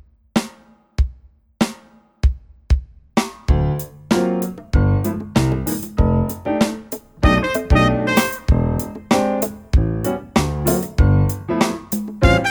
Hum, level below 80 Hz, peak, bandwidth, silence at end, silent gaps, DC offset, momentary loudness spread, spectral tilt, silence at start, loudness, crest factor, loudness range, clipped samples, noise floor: none; -24 dBFS; 0 dBFS; over 20 kHz; 0 s; none; under 0.1%; 8 LU; -6 dB/octave; 0.35 s; -19 LUFS; 18 dB; 5 LU; under 0.1%; -48 dBFS